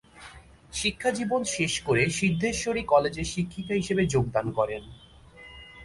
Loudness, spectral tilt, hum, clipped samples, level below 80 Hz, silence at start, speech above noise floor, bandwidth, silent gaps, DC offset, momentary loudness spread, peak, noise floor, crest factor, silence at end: -26 LUFS; -4.5 dB/octave; none; under 0.1%; -48 dBFS; 0.15 s; 23 dB; 11.5 kHz; none; under 0.1%; 21 LU; -8 dBFS; -49 dBFS; 20 dB; 0 s